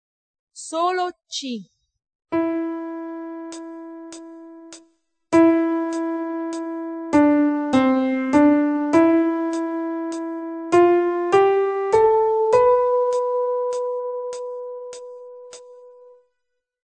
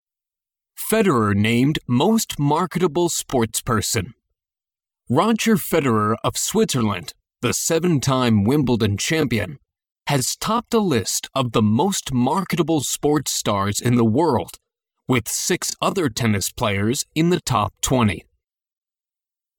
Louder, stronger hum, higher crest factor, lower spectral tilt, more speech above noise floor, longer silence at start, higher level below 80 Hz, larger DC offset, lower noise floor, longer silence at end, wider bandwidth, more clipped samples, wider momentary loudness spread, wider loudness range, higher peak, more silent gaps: about the same, -20 LUFS vs -20 LUFS; neither; about the same, 18 dB vs 16 dB; about the same, -5 dB/octave vs -4.5 dB/octave; second, 53 dB vs over 70 dB; second, 0.55 s vs 0.8 s; second, -60 dBFS vs -48 dBFS; neither; second, -78 dBFS vs under -90 dBFS; second, 1 s vs 1.35 s; second, 9 kHz vs 19 kHz; neither; first, 21 LU vs 5 LU; first, 11 LU vs 2 LU; about the same, -4 dBFS vs -4 dBFS; about the same, 2.15-2.19 s vs 9.92-9.96 s